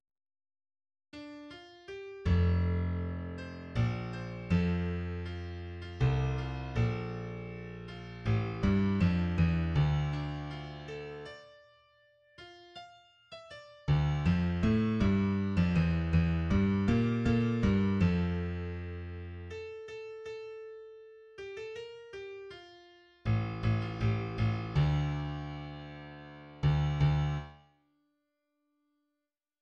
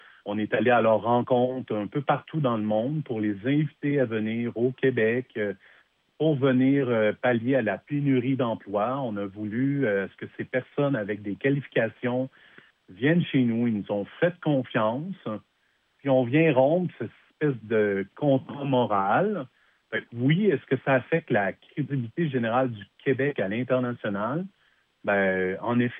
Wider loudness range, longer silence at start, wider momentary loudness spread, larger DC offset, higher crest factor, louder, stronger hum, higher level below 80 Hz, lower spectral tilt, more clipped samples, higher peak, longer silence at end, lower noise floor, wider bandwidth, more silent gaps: first, 14 LU vs 3 LU; first, 1.15 s vs 0.25 s; first, 19 LU vs 10 LU; neither; about the same, 18 dB vs 16 dB; second, -32 LUFS vs -26 LUFS; neither; first, -44 dBFS vs -78 dBFS; second, -8.5 dB/octave vs -10.5 dB/octave; neither; second, -16 dBFS vs -8 dBFS; first, 2.05 s vs 0 s; first, -88 dBFS vs -70 dBFS; first, 7.4 kHz vs 3.8 kHz; neither